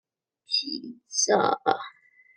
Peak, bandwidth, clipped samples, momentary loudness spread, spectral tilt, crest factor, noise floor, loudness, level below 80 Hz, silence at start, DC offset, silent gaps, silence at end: -4 dBFS; 10.5 kHz; under 0.1%; 13 LU; -1.5 dB/octave; 24 dB; -48 dBFS; -26 LUFS; -80 dBFS; 0.5 s; under 0.1%; none; 0.5 s